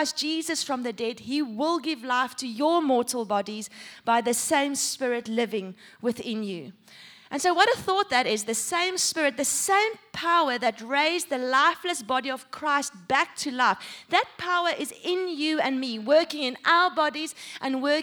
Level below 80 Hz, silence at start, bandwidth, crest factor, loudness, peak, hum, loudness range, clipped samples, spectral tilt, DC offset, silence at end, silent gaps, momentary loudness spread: -72 dBFS; 0 s; over 20 kHz; 20 dB; -25 LUFS; -6 dBFS; none; 3 LU; under 0.1%; -2 dB/octave; under 0.1%; 0 s; none; 10 LU